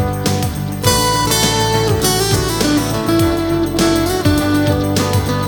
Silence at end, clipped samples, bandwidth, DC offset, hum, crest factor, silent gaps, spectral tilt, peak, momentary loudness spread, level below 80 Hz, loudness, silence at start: 0 s; under 0.1%; over 20 kHz; under 0.1%; none; 14 dB; none; -4.5 dB/octave; 0 dBFS; 4 LU; -30 dBFS; -15 LUFS; 0 s